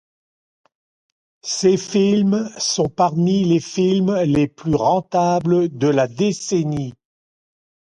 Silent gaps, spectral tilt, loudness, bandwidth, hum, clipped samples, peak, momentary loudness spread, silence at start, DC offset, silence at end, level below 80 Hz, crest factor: none; -5.5 dB/octave; -18 LUFS; 10 kHz; none; under 0.1%; -4 dBFS; 4 LU; 1.45 s; under 0.1%; 1 s; -52 dBFS; 16 dB